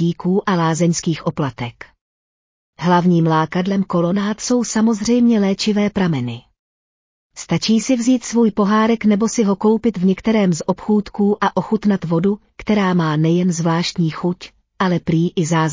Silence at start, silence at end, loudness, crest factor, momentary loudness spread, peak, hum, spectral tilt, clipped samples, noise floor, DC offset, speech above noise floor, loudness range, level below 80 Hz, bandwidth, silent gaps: 0 s; 0 s; -17 LUFS; 14 dB; 7 LU; -4 dBFS; none; -6 dB/octave; under 0.1%; under -90 dBFS; under 0.1%; over 73 dB; 3 LU; -50 dBFS; 7.6 kHz; 2.01-2.73 s, 6.59-7.30 s